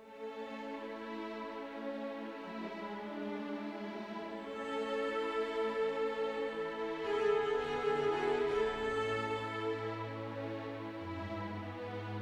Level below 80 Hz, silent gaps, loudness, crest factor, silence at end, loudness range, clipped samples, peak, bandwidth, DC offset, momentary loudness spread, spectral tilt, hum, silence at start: -66 dBFS; none; -38 LUFS; 16 dB; 0 s; 8 LU; under 0.1%; -22 dBFS; 10 kHz; under 0.1%; 10 LU; -6 dB/octave; none; 0 s